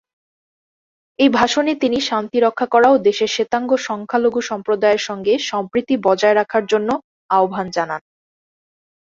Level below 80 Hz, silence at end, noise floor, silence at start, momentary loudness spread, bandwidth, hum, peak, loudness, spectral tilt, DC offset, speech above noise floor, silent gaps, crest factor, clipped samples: -60 dBFS; 1.1 s; under -90 dBFS; 1.2 s; 8 LU; 7.8 kHz; none; -2 dBFS; -17 LUFS; -4 dB/octave; under 0.1%; over 73 dB; 7.04-7.29 s; 16 dB; under 0.1%